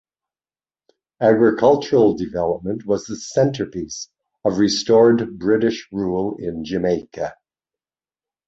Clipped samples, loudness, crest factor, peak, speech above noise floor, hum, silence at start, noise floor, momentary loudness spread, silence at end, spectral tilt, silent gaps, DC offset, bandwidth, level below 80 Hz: under 0.1%; -19 LUFS; 18 dB; -2 dBFS; over 72 dB; none; 1.2 s; under -90 dBFS; 14 LU; 1.15 s; -5.5 dB/octave; none; under 0.1%; 8 kHz; -52 dBFS